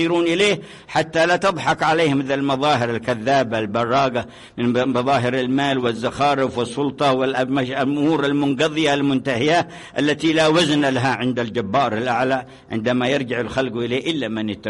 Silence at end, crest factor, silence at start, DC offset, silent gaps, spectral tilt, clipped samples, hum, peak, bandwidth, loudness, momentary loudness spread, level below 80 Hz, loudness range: 0 s; 12 dB; 0 s; under 0.1%; none; -5 dB/octave; under 0.1%; none; -6 dBFS; 11.5 kHz; -19 LUFS; 6 LU; -54 dBFS; 2 LU